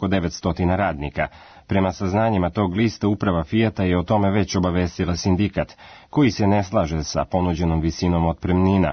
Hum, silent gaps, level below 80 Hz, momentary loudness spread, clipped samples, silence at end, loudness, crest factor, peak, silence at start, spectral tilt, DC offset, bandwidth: none; none; -40 dBFS; 5 LU; under 0.1%; 0 s; -21 LUFS; 14 dB; -6 dBFS; 0 s; -6.5 dB/octave; under 0.1%; 6.6 kHz